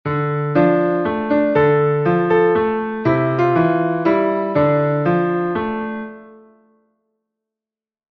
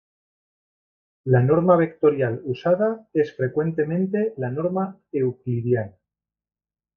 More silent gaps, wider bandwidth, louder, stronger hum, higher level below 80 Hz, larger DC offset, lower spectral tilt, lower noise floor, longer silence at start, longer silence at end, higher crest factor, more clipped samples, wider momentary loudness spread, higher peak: neither; about the same, 5.8 kHz vs 5.4 kHz; first, -17 LUFS vs -22 LUFS; neither; first, -52 dBFS vs -60 dBFS; neither; about the same, -10 dB/octave vs -10.5 dB/octave; about the same, -90 dBFS vs -88 dBFS; second, 0.05 s vs 1.25 s; first, 1.8 s vs 1.1 s; second, 14 dB vs 20 dB; neither; second, 6 LU vs 9 LU; about the same, -4 dBFS vs -4 dBFS